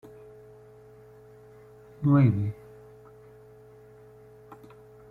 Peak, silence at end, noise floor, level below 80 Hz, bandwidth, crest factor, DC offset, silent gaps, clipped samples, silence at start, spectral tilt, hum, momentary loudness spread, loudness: -10 dBFS; 2.6 s; -52 dBFS; -60 dBFS; 4.2 kHz; 20 dB; under 0.1%; none; under 0.1%; 2 s; -11 dB/octave; none; 30 LU; -24 LUFS